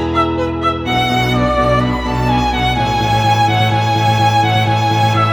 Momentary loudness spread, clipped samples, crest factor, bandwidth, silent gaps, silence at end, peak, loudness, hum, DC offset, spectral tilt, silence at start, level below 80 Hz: 4 LU; under 0.1%; 12 dB; 18.5 kHz; none; 0 s; -2 dBFS; -14 LUFS; none; under 0.1%; -5.5 dB/octave; 0 s; -28 dBFS